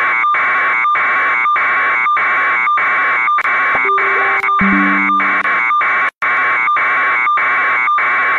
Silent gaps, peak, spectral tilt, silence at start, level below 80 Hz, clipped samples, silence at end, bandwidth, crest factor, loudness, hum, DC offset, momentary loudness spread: 6.17-6.21 s; -2 dBFS; -5.5 dB/octave; 0 s; -52 dBFS; under 0.1%; 0 s; 7.2 kHz; 10 dB; -12 LUFS; none; under 0.1%; 1 LU